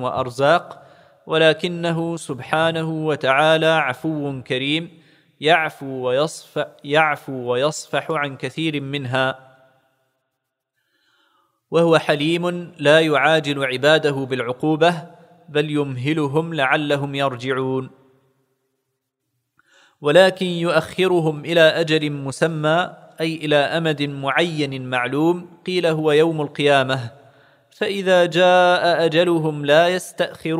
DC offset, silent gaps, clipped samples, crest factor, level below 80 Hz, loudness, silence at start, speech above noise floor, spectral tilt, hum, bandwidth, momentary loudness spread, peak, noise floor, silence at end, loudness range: under 0.1%; none; under 0.1%; 18 dB; -66 dBFS; -19 LUFS; 0 s; 59 dB; -5.5 dB/octave; none; 15.5 kHz; 10 LU; 0 dBFS; -78 dBFS; 0 s; 6 LU